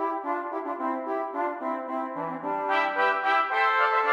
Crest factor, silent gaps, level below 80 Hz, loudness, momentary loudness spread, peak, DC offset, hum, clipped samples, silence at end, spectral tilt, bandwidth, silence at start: 16 dB; none; -82 dBFS; -27 LUFS; 9 LU; -10 dBFS; under 0.1%; none; under 0.1%; 0 s; -5 dB/octave; 12.5 kHz; 0 s